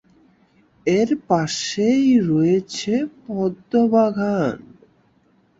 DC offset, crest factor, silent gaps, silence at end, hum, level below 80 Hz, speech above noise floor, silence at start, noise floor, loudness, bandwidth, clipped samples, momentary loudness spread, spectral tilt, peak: under 0.1%; 16 dB; none; 1 s; none; -60 dBFS; 40 dB; 0.85 s; -59 dBFS; -20 LUFS; 8 kHz; under 0.1%; 8 LU; -6 dB/octave; -4 dBFS